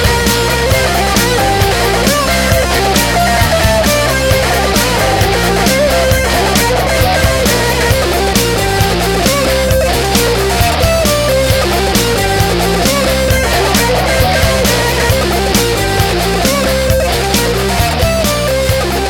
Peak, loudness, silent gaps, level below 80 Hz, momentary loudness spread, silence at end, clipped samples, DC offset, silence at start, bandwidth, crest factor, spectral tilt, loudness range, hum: 0 dBFS; -11 LUFS; none; -20 dBFS; 2 LU; 0 s; under 0.1%; under 0.1%; 0 s; 19 kHz; 10 dB; -4 dB/octave; 1 LU; none